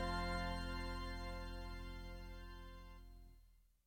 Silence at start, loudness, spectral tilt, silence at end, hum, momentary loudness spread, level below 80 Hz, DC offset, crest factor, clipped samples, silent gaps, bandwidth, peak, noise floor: 0 s; -48 LUFS; -5.5 dB/octave; 0.25 s; none; 19 LU; -50 dBFS; under 0.1%; 16 dB; under 0.1%; none; 17.5 kHz; -30 dBFS; -68 dBFS